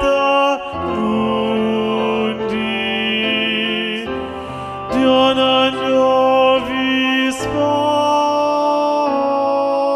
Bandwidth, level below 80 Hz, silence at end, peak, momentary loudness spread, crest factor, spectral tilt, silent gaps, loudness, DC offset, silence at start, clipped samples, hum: 13 kHz; -46 dBFS; 0 s; -2 dBFS; 8 LU; 14 dB; -4.5 dB/octave; none; -16 LUFS; under 0.1%; 0 s; under 0.1%; none